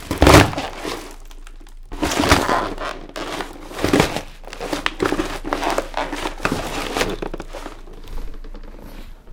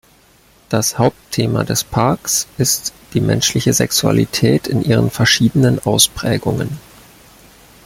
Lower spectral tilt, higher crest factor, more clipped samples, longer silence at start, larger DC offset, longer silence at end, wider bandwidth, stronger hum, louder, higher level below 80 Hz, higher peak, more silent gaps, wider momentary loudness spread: about the same, -4.5 dB/octave vs -4 dB/octave; first, 22 dB vs 16 dB; neither; second, 0 s vs 0.7 s; neither; second, 0 s vs 1.05 s; first, 19 kHz vs 17 kHz; neither; second, -20 LUFS vs -15 LUFS; first, -32 dBFS vs -44 dBFS; about the same, 0 dBFS vs 0 dBFS; neither; first, 23 LU vs 7 LU